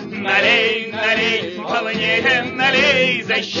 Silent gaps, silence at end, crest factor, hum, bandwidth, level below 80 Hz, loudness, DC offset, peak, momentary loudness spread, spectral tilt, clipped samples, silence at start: none; 0 s; 16 dB; none; 7.4 kHz; -58 dBFS; -16 LUFS; under 0.1%; -2 dBFS; 7 LU; -3.5 dB/octave; under 0.1%; 0 s